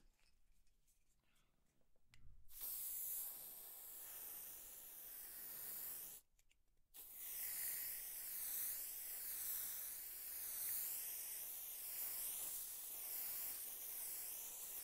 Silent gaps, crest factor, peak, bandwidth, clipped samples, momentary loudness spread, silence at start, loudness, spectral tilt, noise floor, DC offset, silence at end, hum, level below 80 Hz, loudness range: none; 18 dB; -32 dBFS; 16 kHz; under 0.1%; 10 LU; 0 s; -46 LUFS; 1 dB/octave; -77 dBFS; under 0.1%; 0 s; none; -76 dBFS; 6 LU